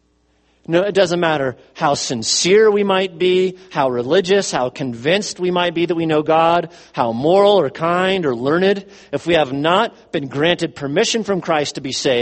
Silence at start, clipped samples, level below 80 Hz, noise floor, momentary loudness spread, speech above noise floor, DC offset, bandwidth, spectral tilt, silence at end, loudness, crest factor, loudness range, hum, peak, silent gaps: 0.7 s; under 0.1%; -56 dBFS; -60 dBFS; 8 LU; 43 dB; under 0.1%; 8.8 kHz; -4 dB/octave; 0 s; -17 LUFS; 16 dB; 2 LU; none; 0 dBFS; none